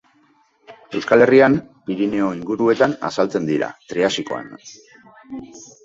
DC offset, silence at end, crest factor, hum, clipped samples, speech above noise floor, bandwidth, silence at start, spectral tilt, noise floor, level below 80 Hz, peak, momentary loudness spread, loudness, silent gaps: under 0.1%; 0.2 s; 18 dB; none; under 0.1%; 40 dB; 8 kHz; 0.7 s; -5.5 dB/octave; -58 dBFS; -58 dBFS; 0 dBFS; 23 LU; -18 LUFS; none